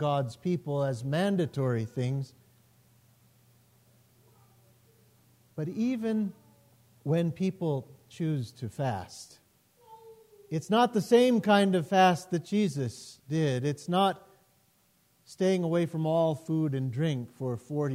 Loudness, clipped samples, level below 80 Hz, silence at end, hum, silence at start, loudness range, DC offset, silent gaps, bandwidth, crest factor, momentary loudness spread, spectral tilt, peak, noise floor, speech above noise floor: -29 LUFS; under 0.1%; -72 dBFS; 0 s; none; 0 s; 11 LU; under 0.1%; none; 16 kHz; 18 dB; 13 LU; -6.5 dB/octave; -12 dBFS; -68 dBFS; 40 dB